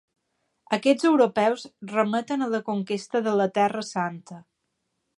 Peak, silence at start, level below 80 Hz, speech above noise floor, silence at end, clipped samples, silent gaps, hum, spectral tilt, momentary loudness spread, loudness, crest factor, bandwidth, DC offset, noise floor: -6 dBFS; 0.7 s; -76 dBFS; 53 dB; 0.75 s; under 0.1%; none; none; -5.5 dB/octave; 10 LU; -24 LUFS; 18 dB; 11.5 kHz; under 0.1%; -77 dBFS